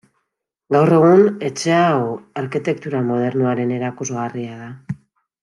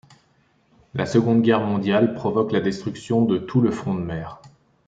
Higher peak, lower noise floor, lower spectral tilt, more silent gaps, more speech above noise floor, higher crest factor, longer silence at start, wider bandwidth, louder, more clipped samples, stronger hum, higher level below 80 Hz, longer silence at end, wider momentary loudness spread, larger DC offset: about the same, -2 dBFS vs -4 dBFS; first, -77 dBFS vs -62 dBFS; about the same, -6.5 dB/octave vs -7.5 dB/octave; neither; first, 60 dB vs 41 dB; about the same, 16 dB vs 18 dB; second, 0.7 s vs 0.95 s; first, 11.5 kHz vs 8 kHz; first, -17 LUFS vs -21 LUFS; neither; neither; second, -62 dBFS vs -56 dBFS; about the same, 0.45 s vs 0.4 s; first, 19 LU vs 12 LU; neither